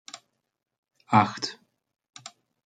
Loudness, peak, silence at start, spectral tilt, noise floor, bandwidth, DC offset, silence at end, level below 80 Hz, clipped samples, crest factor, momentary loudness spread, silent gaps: -25 LUFS; -4 dBFS; 0.15 s; -5 dB/octave; -50 dBFS; 9.4 kHz; under 0.1%; 1.1 s; -74 dBFS; under 0.1%; 26 dB; 24 LU; 0.78-0.83 s